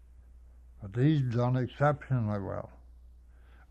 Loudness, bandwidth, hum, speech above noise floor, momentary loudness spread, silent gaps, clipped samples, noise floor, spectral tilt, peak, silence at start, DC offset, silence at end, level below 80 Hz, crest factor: -30 LUFS; 6.8 kHz; none; 26 dB; 14 LU; none; under 0.1%; -55 dBFS; -9.5 dB/octave; -14 dBFS; 0.35 s; under 0.1%; 0.95 s; -54 dBFS; 18 dB